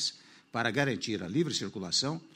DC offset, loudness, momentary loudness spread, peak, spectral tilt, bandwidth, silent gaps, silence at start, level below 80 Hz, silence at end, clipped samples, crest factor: under 0.1%; -31 LUFS; 5 LU; -12 dBFS; -3.5 dB/octave; 16 kHz; none; 0 s; -70 dBFS; 0.1 s; under 0.1%; 20 dB